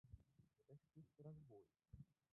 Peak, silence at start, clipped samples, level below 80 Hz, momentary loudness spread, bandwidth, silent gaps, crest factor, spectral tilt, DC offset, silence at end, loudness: -48 dBFS; 0.05 s; under 0.1%; -76 dBFS; 7 LU; 1.9 kHz; none; 18 dB; -9.5 dB/octave; under 0.1%; 0.2 s; -66 LUFS